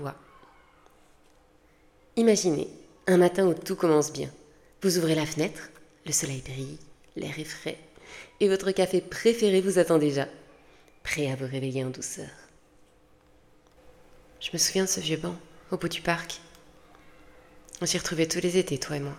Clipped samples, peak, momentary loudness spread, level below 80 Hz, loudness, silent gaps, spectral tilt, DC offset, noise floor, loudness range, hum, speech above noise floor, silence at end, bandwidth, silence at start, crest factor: under 0.1%; -8 dBFS; 17 LU; -58 dBFS; -27 LUFS; none; -4 dB/octave; under 0.1%; -60 dBFS; 8 LU; none; 34 dB; 0 s; 17 kHz; 0 s; 20 dB